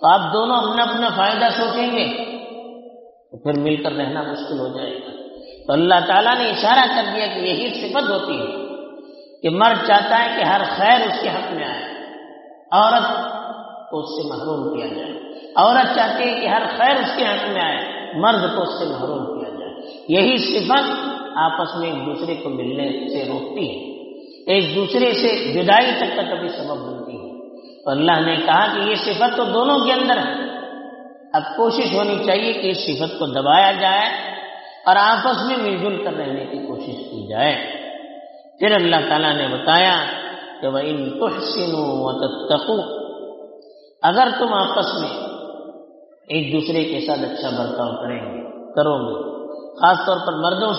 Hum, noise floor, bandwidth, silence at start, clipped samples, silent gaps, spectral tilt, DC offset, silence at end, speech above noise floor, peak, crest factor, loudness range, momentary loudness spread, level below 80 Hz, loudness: none; -45 dBFS; 6 kHz; 0 s; under 0.1%; none; -1.5 dB/octave; under 0.1%; 0 s; 27 dB; 0 dBFS; 20 dB; 6 LU; 17 LU; -66 dBFS; -18 LUFS